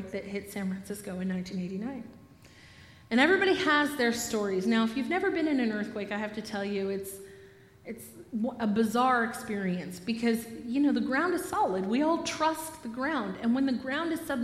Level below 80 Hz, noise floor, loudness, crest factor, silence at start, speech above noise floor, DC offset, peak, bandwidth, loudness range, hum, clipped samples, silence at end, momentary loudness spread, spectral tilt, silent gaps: -64 dBFS; -54 dBFS; -29 LUFS; 22 dB; 0 s; 25 dB; under 0.1%; -8 dBFS; 15.5 kHz; 6 LU; none; under 0.1%; 0 s; 13 LU; -4.5 dB/octave; none